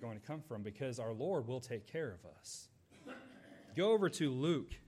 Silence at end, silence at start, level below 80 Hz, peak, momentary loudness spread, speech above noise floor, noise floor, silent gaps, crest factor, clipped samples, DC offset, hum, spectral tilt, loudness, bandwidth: 0.1 s; 0 s; -66 dBFS; -22 dBFS; 20 LU; 19 dB; -58 dBFS; none; 18 dB; under 0.1%; under 0.1%; none; -5.5 dB/octave; -39 LUFS; 14.5 kHz